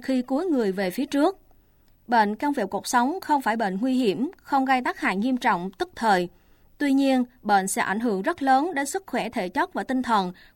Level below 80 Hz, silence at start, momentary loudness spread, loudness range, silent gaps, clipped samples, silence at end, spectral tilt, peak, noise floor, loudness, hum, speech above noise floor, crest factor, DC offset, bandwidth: -60 dBFS; 0 s; 6 LU; 1 LU; none; under 0.1%; 0.25 s; -4.5 dB/octave; -8 dBFS; -58 dBFS; -24 LUFS; none; 34 dB; 16 dB; under 0.1%; 17 kHz